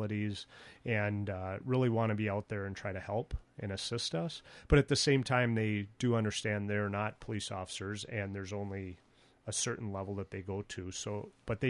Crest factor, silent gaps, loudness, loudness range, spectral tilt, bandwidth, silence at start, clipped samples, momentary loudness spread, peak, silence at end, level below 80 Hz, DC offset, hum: 22 dB; none; -35 LUFS; 8 LU; -5 dB/octave; 11.5 kHz; 0 s; under 0.1%; 12 LU; -14 dBFS; 0 s; -50 dBFS; under 0.1%; none